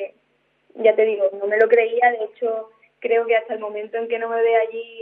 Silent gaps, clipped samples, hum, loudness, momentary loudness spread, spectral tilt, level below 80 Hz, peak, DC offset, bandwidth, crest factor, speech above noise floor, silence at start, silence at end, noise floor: none; under 0.1%; none; -20 LUFS; 12 LU; -6 dB/octave; -84 dBFS; -2 dBFS; under 0.1%; 3.9 kHz; 18 dB; 46 dB; 0 s; 0 s; -65 dBFS